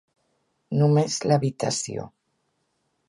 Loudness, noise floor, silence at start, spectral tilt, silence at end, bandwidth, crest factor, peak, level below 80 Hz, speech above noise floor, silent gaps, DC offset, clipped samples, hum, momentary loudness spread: -23 LUFS; -73 dBFS; 0.7 s; -5.5 dB/octave; 1 s; 11.5 kHz; 18 dB; -6 dBFS; -64 dBFS; 51 dB; none; under 0.1%; under 0.1%; none; 11 LU